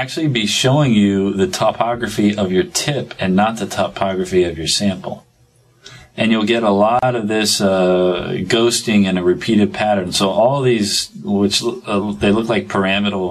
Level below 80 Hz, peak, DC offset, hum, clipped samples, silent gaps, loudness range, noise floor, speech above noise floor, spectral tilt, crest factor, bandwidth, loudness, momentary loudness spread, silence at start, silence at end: -44 dBFS; 0 dBFS; under 0.1%; none; under 0.1%; none; 4 LU; -53 dBFS; 37 dB; -4.5 dB/octave; 16 dB; 14 kHz; -16 LUFS; 7 LU; 0 s; 0 s